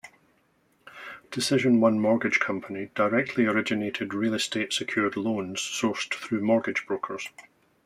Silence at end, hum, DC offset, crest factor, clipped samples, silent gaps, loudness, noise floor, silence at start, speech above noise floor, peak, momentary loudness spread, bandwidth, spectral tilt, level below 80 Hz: 0.45 s; none; under 0.1%; 18 dB; under 0.1%; none; -26 LUFS; -67 dBFS; 0.05 s; 41 dB; -8 dBFS; 12 LU; 14.5 kHz; -4.5 dB/octave; -70 dBFS